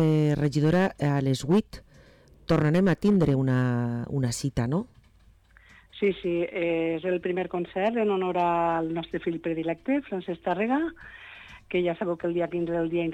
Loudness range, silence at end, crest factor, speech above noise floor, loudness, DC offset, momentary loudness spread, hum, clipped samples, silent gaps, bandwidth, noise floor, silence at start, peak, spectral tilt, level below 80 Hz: 5 LU; 0 s; 12 dB; 32 dB; -26 LUFS; under 0.1%; 9 LU; none; under 0.1%; none; 13 kHz; -58 dBFS; 0 s; -14 dBFS; -7 dB/octave; -52 dBFS